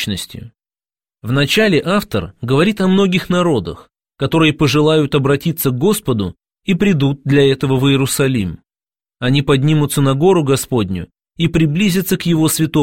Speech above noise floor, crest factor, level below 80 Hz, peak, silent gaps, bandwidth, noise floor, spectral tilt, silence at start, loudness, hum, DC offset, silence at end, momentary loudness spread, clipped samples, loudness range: over 76 dB; 14 dB; -42 dBFS; -2 dBFS; none; 16.5 kHz; under -90 dBFS; -5.5 dB/octave; 0 s; -15 LUFS; none; 0.6%; 0 s; 10 LU; under 0.1%; 1 LU